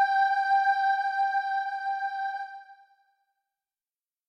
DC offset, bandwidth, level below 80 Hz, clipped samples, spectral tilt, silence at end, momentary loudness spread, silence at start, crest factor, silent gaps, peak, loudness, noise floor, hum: under 0.1%; 6.6 kHz; under -90 dBFS; under 0.1%; 3.5 dB/octave; 1.55 s; 12 LU; 0 s; 14 dB; none; -14 dBFS; -27 LUFS; under -90 dBFS; none